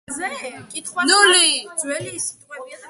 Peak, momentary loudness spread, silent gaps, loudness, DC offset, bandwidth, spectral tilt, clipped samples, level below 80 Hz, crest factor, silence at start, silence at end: 0 dBFS; 19 LU; none; -17 LUFS; under 0.1%; 12 kHz; 0 dB/octave; under 0.1%; -66 dBFS; 20 dB; 0.1 s; 0 s